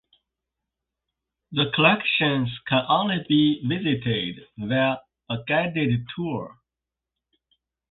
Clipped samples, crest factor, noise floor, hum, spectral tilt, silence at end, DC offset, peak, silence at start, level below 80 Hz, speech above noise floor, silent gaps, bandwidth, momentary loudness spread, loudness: under 0.1%; 22 dB; -88 dBFS; none; -10.5 dB/octave; 1.4 s; under 0.1%; -4 dBFS; 1.5 s; -58 dBFS; 64 dB; none; 4.4 kHz; 14 LU; -23 LUFS